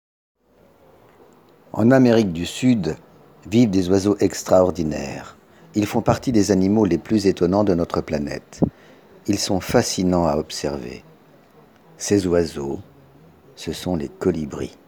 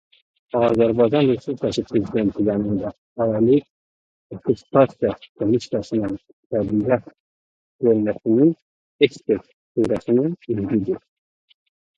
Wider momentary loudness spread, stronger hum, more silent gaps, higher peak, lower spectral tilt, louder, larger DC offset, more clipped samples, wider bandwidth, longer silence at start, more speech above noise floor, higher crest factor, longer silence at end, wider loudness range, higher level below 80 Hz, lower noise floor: first, 13 LU vs 10 LU; neither; second, none vs 2.98-3.16 s, 3.70-4.30 s, 5.29-5.35 s, 6.33-6.50 s, 7.20-7.79 s, 8.62-8.99 s, 9.54-9.75 s; about the same, 0 dBFS vs 0 dBFS; second, -6 dB/octave vs -8 dB/octave; about the same, -20 LUFS vs -21 LUFS; neither; neither; first, over 20 kHz vs 7.8 kHz; first, 1.75 s vs 0.55 s; second, 35 dB vs over 70 dB; about the same, 20 dB vs 20 dB; second, 0.2 s vs 1 s; first, 6 LU vs 3 LU; about the same, -48 dBFS vs -52 dBFS; second, -55 dBFS vs under -90 dBFS